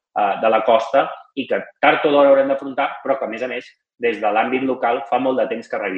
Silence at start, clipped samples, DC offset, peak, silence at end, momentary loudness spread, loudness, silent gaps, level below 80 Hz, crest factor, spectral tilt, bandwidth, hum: 0.15 s; under 0.1%; under 0.1%; 0 dBFS; 0 s; 10 LU; -18 LUFS; none; -70 dBFS; 18 dB; -5.5 dB/octave; 7.4 kHz; none